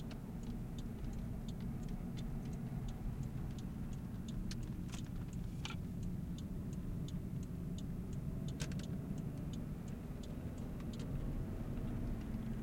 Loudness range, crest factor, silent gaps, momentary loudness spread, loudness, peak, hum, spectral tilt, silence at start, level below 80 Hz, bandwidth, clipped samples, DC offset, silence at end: 1 LU; 16 dB; none; 3 LU; -45 LUFS; -28 dBFS; none; -7 dB/octave; 0 s; -48 dBFS; 16.5 kHz; under 0.1%; under 0.1%; 0 s